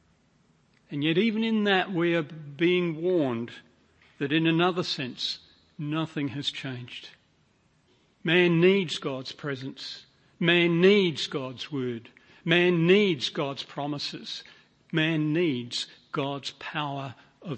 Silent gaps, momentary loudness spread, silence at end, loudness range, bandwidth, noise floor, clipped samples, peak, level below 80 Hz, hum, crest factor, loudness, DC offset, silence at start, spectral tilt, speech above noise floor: none; 17 LU; 0 s; 6 LU; 8.6 kHz; -66 dBFS; under 0.1%; -8 dBFS; -72 dBFS; none; 20 dB; -26 LUFS; under 0.1%; 0.9 s; -6 dB/octave; 40 dB